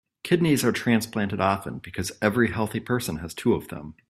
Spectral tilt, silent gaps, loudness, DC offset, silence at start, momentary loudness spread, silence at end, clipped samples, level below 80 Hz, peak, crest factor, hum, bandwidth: -5.5 dB/octave; none; -25 LUFS; under 0.1%; 0.25 s; 10 LU; 0.2 s; under 0.1%; -54 dBFS; -4 dBFS; 20 dB; none; 15 kHz